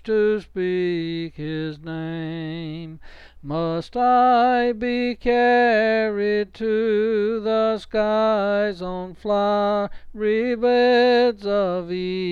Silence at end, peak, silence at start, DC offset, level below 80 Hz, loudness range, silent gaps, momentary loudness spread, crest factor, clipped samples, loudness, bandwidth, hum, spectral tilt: 0 s; -8 dBFS; 0.05 s; under 0.1%; -48 dBFS; 7 LU; none; 13 LU; 12 dB; under 0.1%; -21 LUFS; 7 kHz; none; -7 dB/octave